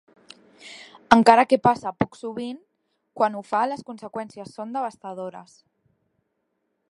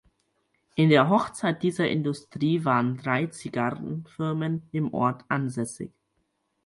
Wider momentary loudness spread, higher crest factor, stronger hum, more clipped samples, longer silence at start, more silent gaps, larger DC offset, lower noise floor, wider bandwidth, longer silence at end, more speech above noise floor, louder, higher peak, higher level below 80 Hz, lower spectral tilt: first, 24 LU vs 13 LU; about the same, 24 dB vs 20 dB; neither; neither; about the same, 0.65 s vs 0.75 s; neither; neither; about the same, -75 dBFS vs -75 dBFS; about the same, 11.5 kHz vs 11.5 kHz; first, 1.5 s vs 0.8 s; first, 53 dB vs 49 dB; first, -21 LUFS vs -26 LUFS; first, 0 dBFS vs -6 dBFS; first, -58 dBFS vs -64 dBFS; about the same, -5.5 dB/octave vs -6.5 dB/octave